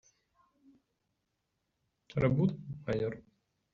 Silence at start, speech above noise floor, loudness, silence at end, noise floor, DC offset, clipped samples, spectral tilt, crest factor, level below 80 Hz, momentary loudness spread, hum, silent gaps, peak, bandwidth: 2.15 s; 51 dB; -33 LUFS; 0.55 s; -83 dBFS; under 0.1%; under 0.1%; -8 dB/octave; 20 dB; -60 dBFS; 13 LU; none; none; -16 dBFS; 7 kHz